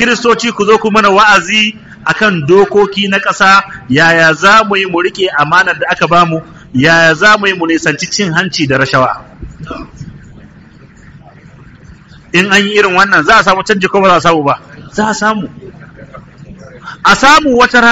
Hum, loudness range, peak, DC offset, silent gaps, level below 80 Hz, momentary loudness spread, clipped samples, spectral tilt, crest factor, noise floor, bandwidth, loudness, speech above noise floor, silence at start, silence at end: none; 7 LU; 0 dBFS; under 0.1%; none; -40 dBFS; 13 LU; 0.4%; -4 dB/octave; 10 dB; -37 dBFS; 13.5 kHz; -8 LUFS; 28 dB; 0 s; 0 s